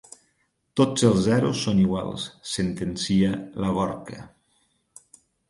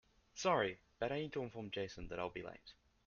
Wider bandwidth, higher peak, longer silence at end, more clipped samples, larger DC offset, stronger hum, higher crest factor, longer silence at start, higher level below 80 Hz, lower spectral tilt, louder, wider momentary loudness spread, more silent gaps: first, 11.5 kHz vs 7 kHz; first, -6 dBFS vs -22 dBFS; first, 1.25 s vs 0.35 s; neither; neither; neither; about the same, 20 dB vs 22 dB; first, 0.75 s vs 0.35 s; first, -50 dBFS vs -64 dBFS; first, -5.5 dB/octave vs -3.5 dB/octave; first, -24 LUFS vs -41 LUFS; second, 12 LU vs 18 LU; neither